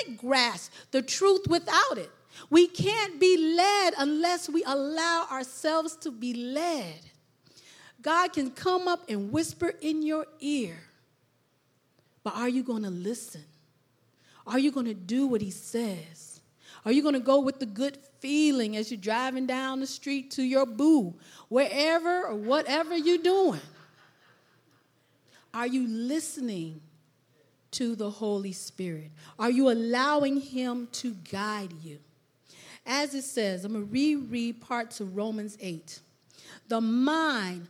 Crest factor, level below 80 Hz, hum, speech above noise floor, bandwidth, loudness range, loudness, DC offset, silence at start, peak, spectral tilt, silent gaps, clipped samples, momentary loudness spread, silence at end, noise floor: 22 dB; -74 dBFS; none; 42 dB; 16 kHz; 9 LU; -28 LUFS; under 0.1%; 0 s; -6 dBFS; -4 dB/octave; none; under 0.1%; 14 LU; 0 s; -70 dBFS